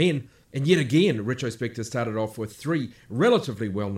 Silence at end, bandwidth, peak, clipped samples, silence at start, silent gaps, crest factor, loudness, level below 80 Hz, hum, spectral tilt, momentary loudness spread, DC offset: 0 s; 16 kHz; -6 dBFS; under 0.1%; 0 s; none; 18 dB; -25 LUFS; -62 dBFS; none; -6 dB/octave; 11 LU; under 0.1%